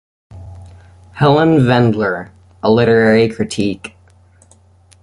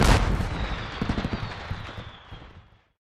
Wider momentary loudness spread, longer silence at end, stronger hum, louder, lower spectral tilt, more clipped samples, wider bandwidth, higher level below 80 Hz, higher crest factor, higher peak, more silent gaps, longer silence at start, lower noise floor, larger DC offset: second, 15 LU vs 21 LU; first, 1.15 s vs 0.4 s; neither; first, -13 LUFS vs -29 LUFS; first, -7 dB/octave vs -5.5 dB/octave; neither; second, 11.5 kHz vs 14 kHz; second, -44 dBFS vs -30 dBFS; second, 14 dB vs 22 dB; about the same, -2 dBFS vs -4 dBFS; neither; first, 0.35 s vs 0 s; second, -48 dBFS vs -52 dBFS; neither